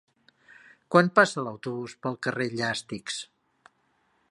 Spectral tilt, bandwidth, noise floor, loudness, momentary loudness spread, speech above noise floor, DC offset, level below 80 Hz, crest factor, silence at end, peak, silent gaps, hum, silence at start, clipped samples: -5 dB/octave; 11.5 kHz; -70 dBFS; -26 LUFS; 14 LU; 44 dB; under 0.1%; -72 dBFS; 26 dB; 1.05 s; -2 dBFS; none; none; 0.9 s; under 0.1%